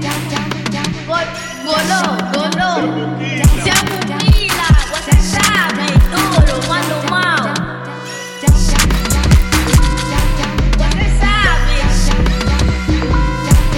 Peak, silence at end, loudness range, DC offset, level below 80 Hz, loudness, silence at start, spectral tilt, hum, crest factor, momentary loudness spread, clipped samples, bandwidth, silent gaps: 0 dBFS; 0 s; 2 LU; under 0.1%; -16 dBFS; -14 LUFS; 0 s; -4.5 dB/octave; none; 12 dB; 7 LU; under 0.1%; 17.5 kHz; none